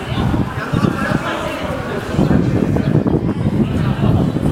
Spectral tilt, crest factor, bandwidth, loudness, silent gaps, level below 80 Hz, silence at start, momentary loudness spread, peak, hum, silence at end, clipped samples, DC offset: -7.5 dB/octave; 16 dB; 15.5 kHz; -17 LUFS; none; -32 dBFS; 0 s; 6 LU; 0 dBFS; none; 0 s; under 0.1%; under 0.1%